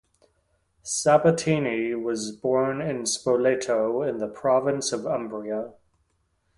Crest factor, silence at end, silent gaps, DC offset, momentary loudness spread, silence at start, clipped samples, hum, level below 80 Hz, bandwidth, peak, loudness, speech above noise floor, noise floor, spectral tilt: 18 dB; 0.85 s; none; under 0.1%; 11 LU; 0.85 s; under 0.1%; none; -62 dBFS; 11.5 kHz; -6 dBFS; -25 LUFS; 47 dB; -71 dBFS; -4.5 dB/octave